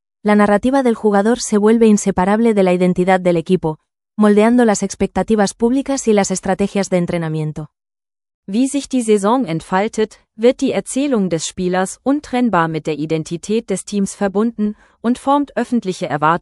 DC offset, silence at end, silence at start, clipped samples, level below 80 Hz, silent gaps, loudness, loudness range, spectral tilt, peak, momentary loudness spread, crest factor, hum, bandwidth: under 0.1%; 0.05 s; 0.25 s; under 0.1%; -46 dBFS; 8.34-8.43 s; -16 LUFS; 5 LU; -5.5 dB/octave; 0 dBFS; 9 LU; 14 dB; none; 12 kHz